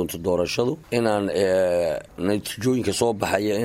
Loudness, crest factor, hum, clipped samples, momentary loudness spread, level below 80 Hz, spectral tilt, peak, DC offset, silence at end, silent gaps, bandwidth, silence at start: -23 LUFS; 16 dB; none; under 0.1%; 5 LU; -52 dBFS; -5 dB/octave; -6 dBFS; under 0.1%; 0 s; none; 16 kHz; 0 s